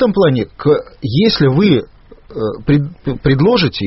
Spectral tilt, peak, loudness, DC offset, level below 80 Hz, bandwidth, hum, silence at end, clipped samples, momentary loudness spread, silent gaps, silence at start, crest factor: -6 dB/octave; 0 dBFS; -14 LUFS; under 0.1%; -36 dBFS; 6 kHz; none; 0 s; under 0.1%; 10 LU; none; 0 s; 14 dB